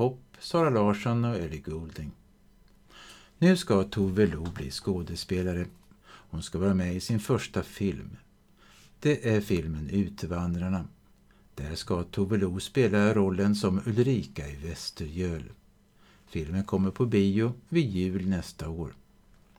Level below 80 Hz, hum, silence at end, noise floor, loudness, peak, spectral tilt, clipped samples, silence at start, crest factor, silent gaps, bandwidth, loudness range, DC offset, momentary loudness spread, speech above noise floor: -50 dBFS; none; 0.65 s; -60 dBFS; -29 LUFS; -10 dBFS; -6.5 dB/octave; under 0.1%; 0 s; 18 dB; none; 15 kHz; 4 LU; under 0.1%; 14 LU; 32 dB